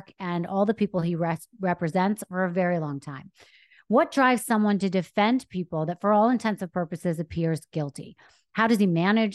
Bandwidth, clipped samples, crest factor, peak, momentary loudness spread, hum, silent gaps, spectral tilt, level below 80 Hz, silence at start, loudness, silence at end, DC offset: 12.5 kHz; under 0.1%; 16 dB; -8 dBFS; 11 LU; none; none; -6.5 dB/octave; -62 dBFS; 0.2 s; -25 LUFS; 0 s; under 0.1%